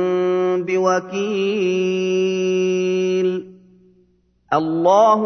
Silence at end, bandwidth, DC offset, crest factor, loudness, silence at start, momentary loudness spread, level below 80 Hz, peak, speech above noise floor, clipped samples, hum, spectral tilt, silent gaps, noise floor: 0 s; 6.6 kHz; under 0.1%; 16 dB; -19 LUFS; 0 s; 6 LU; -66 dBFS; -4 dBFS; 41 dB; under 0.1%; none; -6 dB/octave; none; -59 dBFS